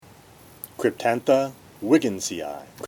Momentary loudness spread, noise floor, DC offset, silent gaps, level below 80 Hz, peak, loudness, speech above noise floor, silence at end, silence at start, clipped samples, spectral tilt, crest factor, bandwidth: 14 LU; -49 dBFS; under 0.1%; none; -64 dBFS; -6 dBFS; -24 LUFS; 27 dB; 0 s; 0.65 s; under 0.1%; -4.5 dB/octave; 20 dB; 18.5 kHz